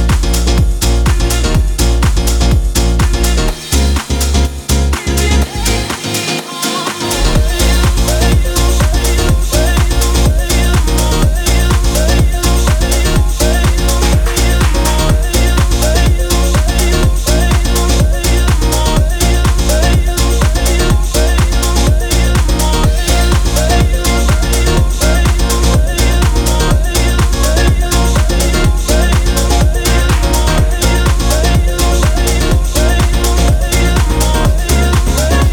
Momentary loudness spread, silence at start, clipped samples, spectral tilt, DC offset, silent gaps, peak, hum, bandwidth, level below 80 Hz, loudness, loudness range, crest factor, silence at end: 2 LU; 0 s; under 0.1%; -4.5 dB/octave; under 0.1%; none; 0 dBFS; none; 18.5 kHz; -12 dBFS; -12 LUFS; 1 LU; 10 dB; 0 s